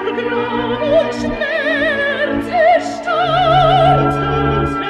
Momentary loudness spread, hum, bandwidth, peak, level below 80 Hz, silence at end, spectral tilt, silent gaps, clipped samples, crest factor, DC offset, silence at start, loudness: 7 LU; none; 11 kHz; -2 dBFS; -34 dBFS; 0 s; -6.5 dB/octave; none; under 0.1%; 12 dB; under 0.1%; 0 s; -15 LUFS